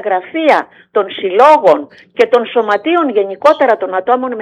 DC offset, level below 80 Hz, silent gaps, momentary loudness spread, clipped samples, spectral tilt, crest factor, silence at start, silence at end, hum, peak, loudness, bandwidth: under 0.1%; -66 dBFS; none; 9 LU; 0.2%; -5 dB/octave; 12 dB; 0 s; 0 s; none; 0 dBFS; -12 LUFS; 10.5 kHz